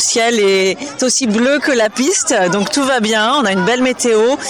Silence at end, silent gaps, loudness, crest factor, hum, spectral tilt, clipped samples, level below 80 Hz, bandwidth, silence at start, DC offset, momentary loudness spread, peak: 0 s; none; -13 LUFS; 8 dB; none; -2.5 dB/octave; under 0.1%; -56 dBFS; over 20 kHz; 0 s; 0.1%; 2 LU; -6 dBFS